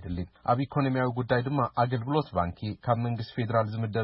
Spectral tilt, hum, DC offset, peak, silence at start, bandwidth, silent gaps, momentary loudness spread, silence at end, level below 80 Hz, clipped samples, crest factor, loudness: -11.5 dB/octave; none; under 0.1%; -12 dBFS; 0 s; 5.8 kHz; none; 6 LU; 0 s; -52 dBFS; under 0.1%; 16 dB; -29 LUFS